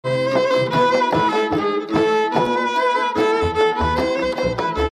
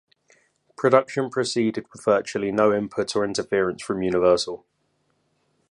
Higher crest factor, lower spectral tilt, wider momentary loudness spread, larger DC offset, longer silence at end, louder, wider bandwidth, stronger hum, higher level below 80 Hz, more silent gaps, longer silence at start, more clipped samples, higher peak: second, 14 dB vs 22 dB; about the same, -5.5 dB/octave vs -5 dB/octave; second, 4 LU vs 7 LU; neither; second, 0 s vs 1.15 s; first, -18 LUFS vs -23 LUFS; first, 13 kHz vs 11 kHz; neither; first, -38 dBFS vs -58 dBFS; neither; second, 0.05 s vs 0.8 s; neither; about the same, -4 dBFS vs -2 dBFS